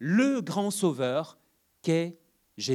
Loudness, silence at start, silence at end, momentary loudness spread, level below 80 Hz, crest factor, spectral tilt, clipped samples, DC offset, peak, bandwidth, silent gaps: -28 LUFS; 0 s; 0 s; 11 LU; -80 dBFS; 16 dB; -5.5 dB/octave; under 0.1%; under 0.1%; -12 dBFS; 15 kHz; none